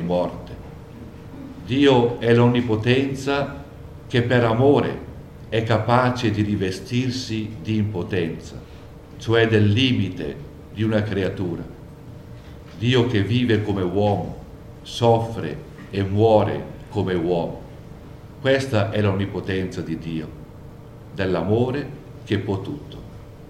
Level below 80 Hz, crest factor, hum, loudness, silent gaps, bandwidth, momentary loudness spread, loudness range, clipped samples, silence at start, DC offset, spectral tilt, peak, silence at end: -46 dBFS; 20 dB; none; -21 LUFS; none; 12 kHz; 23 LU; 5 LU; under 0.1%; 0 s; under 0.1%; -7 dB/octave; -2 dBFS; 0 s